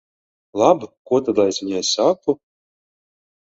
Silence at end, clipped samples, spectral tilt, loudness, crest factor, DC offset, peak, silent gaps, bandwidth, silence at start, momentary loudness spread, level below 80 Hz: 1.1 s; under 0.1%; -4 dB/octave; -19 LUFS; 20 dB; under 0.1%; 0 dBFS; 0.97-1.05 s; 8 kHz; 0.55 s; 8 LU; -62 dBFS